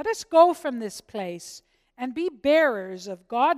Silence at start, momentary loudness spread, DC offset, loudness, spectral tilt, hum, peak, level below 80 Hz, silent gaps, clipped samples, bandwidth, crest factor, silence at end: 0 s; 17 LU; under 0.1%; -23 LUFS; -4 dB/octave; none; -6 dBFS; -66 dBFS; none; under 0.1%; 14.5 kHz; 18 dB; 0 s